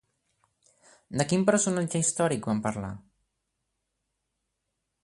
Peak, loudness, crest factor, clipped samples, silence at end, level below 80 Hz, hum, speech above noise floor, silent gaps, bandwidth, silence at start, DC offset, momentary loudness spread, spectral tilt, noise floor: -10 dBFS; -27 LUFS; 22 dB; under 0.1%; 2.05 s; -62 dBFS; none; 55 dB; none; 11.5 kHz; 1.1 s; under 0.1%; 13 LU; -4.5 dB/octave; -82 dBFS